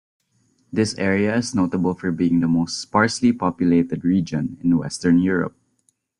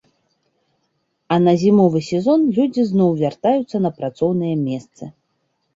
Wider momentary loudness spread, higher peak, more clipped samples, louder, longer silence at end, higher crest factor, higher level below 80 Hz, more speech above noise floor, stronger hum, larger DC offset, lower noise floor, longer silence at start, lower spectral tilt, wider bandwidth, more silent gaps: second, 5 LU vs 11 LU; about the same, -2 dBFS vs -4 dBFS; neither; about the same, -20 LUFS vs -18 LUFS; about the same, 0.7 s vs 0.65 s; about the same, 18 dB vs 16 dB; first, -54 dBFS vs -60 dBFS; second, 47 dB vs 52 dB; neither; neither; about the same, -67 dBFS vs -69 dBFS; second, 0.75 s vs 1.3 s; second, -6 dB/octave vs -8 dB/octave; first, 10.5 kHz vs 7.8 kHz; neither